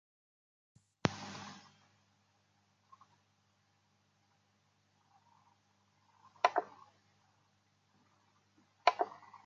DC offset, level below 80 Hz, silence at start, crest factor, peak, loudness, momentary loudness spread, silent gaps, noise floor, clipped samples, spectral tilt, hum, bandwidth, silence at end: under 0.1%; -76 dBFS; 1.05 s; 34 dB; -10 dBFS; -36 LUFS; 19 LU; none; -75 dBFS; under 0.1%; -4.5 dB/octave; 50 Hz at -75 dBFS; 7.8 kHz; 0.1 s